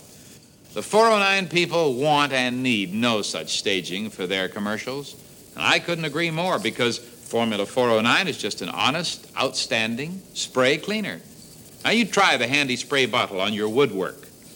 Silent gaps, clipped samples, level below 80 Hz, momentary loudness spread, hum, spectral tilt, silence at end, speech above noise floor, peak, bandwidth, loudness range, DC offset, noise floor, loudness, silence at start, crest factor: none; under 0.1%; -64 dBFS; 12 LU; none; -3.5 dB/octave; 0 s; 25 dB; -4 dBFS; 16.5 kHz; 4 LU; under 0.1%; -48 dBFS; -22 LUFS; 0 s; 20 dB